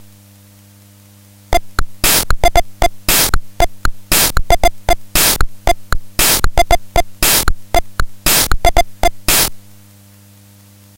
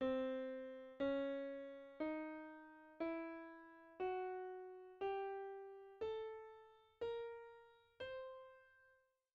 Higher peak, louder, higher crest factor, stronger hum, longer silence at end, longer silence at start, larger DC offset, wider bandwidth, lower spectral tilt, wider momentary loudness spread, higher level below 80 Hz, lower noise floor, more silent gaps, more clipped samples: first, 0 dBFS vs -32 dBFS; first, -14 LUFS vs -48 LUFS; about the same, 14 dB vs 16 dB; neither; first, 1.35 s vs 0.4 s; first, 1.5 s vs 0 s; neither; first, 17.5 kHz vs 6.8 kHz; about the same, -2 dB/octave vs -3 dB/octave; second, 8 LU vs 17 LU; first, -20 dBFS vs -78 dBFS; second, -43 dBFS vs -76 dBFS; neither; neither